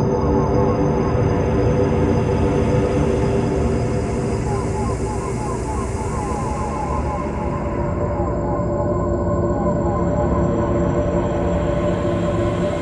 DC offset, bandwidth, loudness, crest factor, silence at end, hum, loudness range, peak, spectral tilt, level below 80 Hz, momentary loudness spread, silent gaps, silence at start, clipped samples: under 0.1%; 11.5 kHz; -20 LUFS; 14 dB; 0 s; none; 5 LU; -6 dBFS; -8 dB/octave; -28 dBFS; 6 LU; none; 0 s; under 0.1%